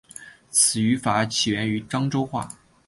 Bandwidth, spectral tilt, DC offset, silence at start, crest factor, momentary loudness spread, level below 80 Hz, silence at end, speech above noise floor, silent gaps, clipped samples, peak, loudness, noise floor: 12 kHz; -3.5 dB/octave; under 0.1%; 0.15 s; 20 dB; 17 LU; -56 dBFS; 0.35 s; 22 dB; none; under 0.1%; -4 dBFS; -22 LUFS; -45 dBFS